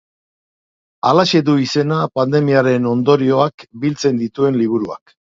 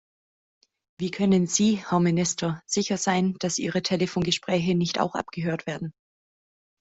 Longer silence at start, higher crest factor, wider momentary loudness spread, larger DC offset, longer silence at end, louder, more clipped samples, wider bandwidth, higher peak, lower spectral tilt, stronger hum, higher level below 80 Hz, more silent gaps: about the same, 1.05 s vs 1 s; about the same, 16 dB vs 18 dB; about the same, 8 LU vs 9 LU; neither; second, 0.35 s vs 0.9 s; first, -16 LUFS vs -25 LUFS; neither; about the same, 7.8 kHz vs 8.2 kHz; first, 0 dBFS vs -8 dBFS; first, -6.5 dB/octave vs -4.5 dB/octave; neither; about the same, -60 dBFS vs -60 dBFS; first, 3.54-3.58 s vs none